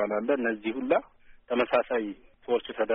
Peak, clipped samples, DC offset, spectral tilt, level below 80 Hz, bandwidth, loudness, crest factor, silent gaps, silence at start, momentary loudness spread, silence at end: -12 dBFS; under 0.1%; under 0.1%; -2.5 dB/octave; -62 dBFS; 4 kHz; -28 LUFS; 18 dB; none; 0 s; 6 LU; 0 s